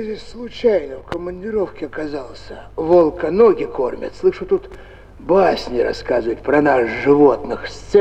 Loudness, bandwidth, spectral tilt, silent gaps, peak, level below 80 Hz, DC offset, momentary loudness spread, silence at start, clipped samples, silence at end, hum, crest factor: -18 LUFS; 8.6 kHz; -6.5 dB/octave; none; -2 dBFS; -42 dBFS; under 0.1%; 15 LU; 0 s; under 0.1%; 0 s; none; 16 dB